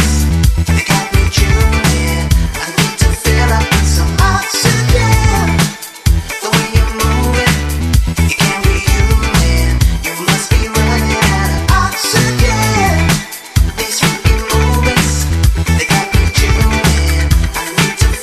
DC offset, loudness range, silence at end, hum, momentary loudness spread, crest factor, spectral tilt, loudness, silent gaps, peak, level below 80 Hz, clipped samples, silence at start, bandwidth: under 0.1%; 1 LU; 0 s; none; 3 LU; 12 dB; -4.5 dB/octave; -12 LUFS; none; 0 dBFS; -16 dBFS; under 0.1%; 0 s; 14.5 kHz